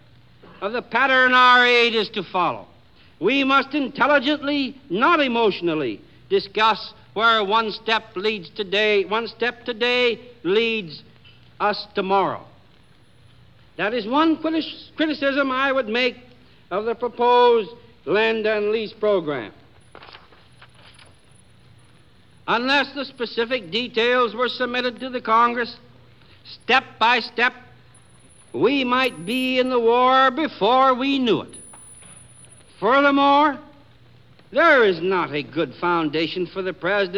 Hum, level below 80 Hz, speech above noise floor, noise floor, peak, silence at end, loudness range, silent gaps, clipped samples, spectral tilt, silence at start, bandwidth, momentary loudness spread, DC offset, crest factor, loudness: none; -62 dBFS; 34 dB; -54 dBFS; -2 dBFS; 0 s; 6 LU; none; under 0.1%; -4.5 dB/octave; 0.6 s; 13 kHz; 12 LU; 0.2%; 18 dB; -20 LUFS